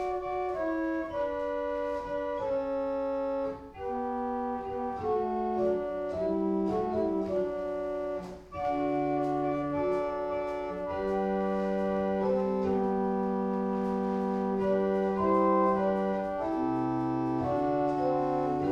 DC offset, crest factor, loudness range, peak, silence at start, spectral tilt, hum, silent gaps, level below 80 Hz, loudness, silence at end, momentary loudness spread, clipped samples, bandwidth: under 0.1%; 14 dB; 4 LU; -14 dBFS; 0 s; -8.5 dB/octave; none; none; -56 dBFS; -30 LUFS; 0 s; 6 LU; under 0.1%; 8.2 kHz